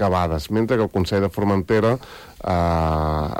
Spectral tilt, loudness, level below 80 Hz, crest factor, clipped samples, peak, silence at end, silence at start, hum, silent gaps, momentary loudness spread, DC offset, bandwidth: -7.5 dB/octave; -21 LUFS; -34 dBFS; 12 dB; under 0.1%; -8 dBFS; 0 s; 0 s; none; none; 6 LU; under 0.1%; 16.5 kHz